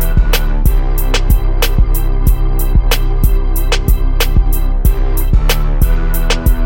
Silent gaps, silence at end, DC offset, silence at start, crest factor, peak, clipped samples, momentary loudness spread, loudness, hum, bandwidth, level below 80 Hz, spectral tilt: none; 0 s; under 0.1%; 0 s; 10 dB; 0 dBFS; under 0.1%; 2 LU; -15 LUFS; none; 17 kHz; -10 dBFS; -5 dB/octave